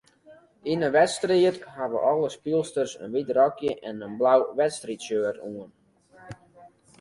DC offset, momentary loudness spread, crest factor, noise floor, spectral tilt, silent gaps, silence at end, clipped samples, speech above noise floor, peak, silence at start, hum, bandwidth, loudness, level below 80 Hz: under 0.1%; 16 LU; 20 dB; -54 dBFS; -5 dB/octave; none; 0.35 s; under 0.1%; 29 dB; -6 dBFS; 0.3 s; none; 11.5 kHz; -25 LUFS; -66 dBFS